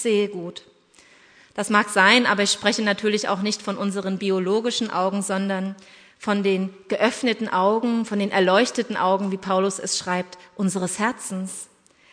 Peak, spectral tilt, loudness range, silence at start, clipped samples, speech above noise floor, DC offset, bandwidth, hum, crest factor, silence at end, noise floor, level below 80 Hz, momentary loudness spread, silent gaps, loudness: -2 dBFS; -4 dB/octave; 4 LU; 0 s; under 0.1%; 31 dB; under 0.1%; 11 kHz; none; 22 dB; 0.5 s; -54 dBFS; -70 dBFS; 12 LU; none; -22 LUFS